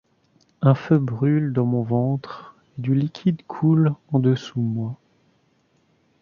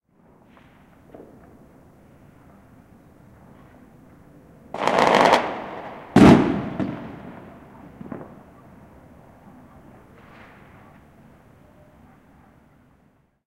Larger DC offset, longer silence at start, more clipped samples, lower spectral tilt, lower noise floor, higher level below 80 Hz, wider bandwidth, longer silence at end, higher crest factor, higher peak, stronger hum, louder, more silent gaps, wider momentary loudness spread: neither; second, 0.6 s vs 4.75 s; neither; first, -9.5 dB/octave vs -6.5 dB/octave; about the same, -64 dBFS vs -61 dBFS; second, -62 dBFS vs -48 dBFS; second, 7 kHz vs 15.5 kHz; second, 1.25 s vs 5.25 s; about the same, 18 dB vs 22 dB; about the same, -4 dBFS vs -2 dBFS; neither; second, -22 LUFS vs -18 LUFS; neither; second, 13 LU vs 30 LU